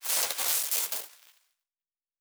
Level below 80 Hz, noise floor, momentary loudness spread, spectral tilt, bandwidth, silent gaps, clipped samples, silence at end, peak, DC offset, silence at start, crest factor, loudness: -90 dBFS; under -90 dBFS; 10 LU; 3 dB/octave; over 20 kHz; none; under 0.1%; 1.1 s; -10 dBFS; under 0.1%; 0 s; 22 dB; -27 LUFS